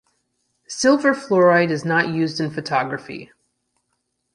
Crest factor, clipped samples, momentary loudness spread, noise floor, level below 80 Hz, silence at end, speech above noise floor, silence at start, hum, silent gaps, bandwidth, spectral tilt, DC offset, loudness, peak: 18 dB; under 0.1%; 16 LU; -73 dBFS; -64 dBFS; 1.1 s; 54 dB; 0.7 s; none; none; 11.5 kHz; -5 dB/octave; under 0.1%; -19 LUFS; -4 dBFS